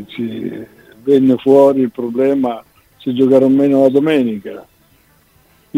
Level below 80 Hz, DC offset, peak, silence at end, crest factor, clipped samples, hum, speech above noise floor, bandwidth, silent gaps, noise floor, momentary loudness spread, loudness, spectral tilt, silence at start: -58 dBFS; under 0.1%; 0 dBFS; 0 s; 14 dB; under 0.1%; none; 39 dB; 9 kHz; none; -52 dBFS; 17 LU; -13 LUFS; -8 dB/octave; 0 s